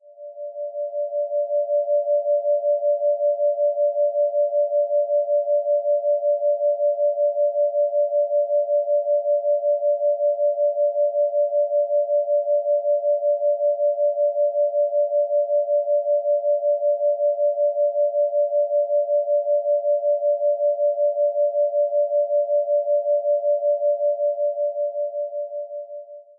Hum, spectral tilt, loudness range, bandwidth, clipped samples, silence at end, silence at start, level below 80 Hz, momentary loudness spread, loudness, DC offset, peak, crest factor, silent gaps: none; -8 dB/octave; 1 LU; 0.8 kHz; under 0.1%; 0.15 s; 0.05 s; under -90 dBFS; 4 LU; -21 LUFS; under 0.1%; -14 dBFS; 8 dB; none